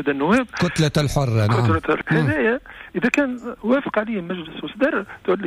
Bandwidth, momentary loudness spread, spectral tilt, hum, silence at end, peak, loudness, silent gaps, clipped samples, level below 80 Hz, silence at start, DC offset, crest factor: 14 kHz; 9 LU; -6.5 dB/octave; none; 0 s; -8 dBFS; -21 LUFS; none; under 0.1%; -44 dBFS; 0 s; under 0.1%; 14 dB